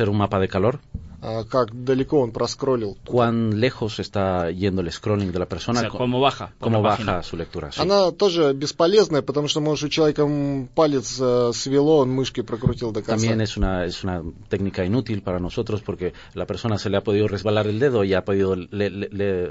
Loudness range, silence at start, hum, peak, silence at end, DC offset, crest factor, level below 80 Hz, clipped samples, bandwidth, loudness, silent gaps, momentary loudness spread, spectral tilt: 4 LU; 0 s; none; -4 dBFS; 0 s; under 0.1%; 18 dB; -42 dBFS; under 0.1%; 8 kHz; -22 LUFS; none; 9 LU; -6 dB/octave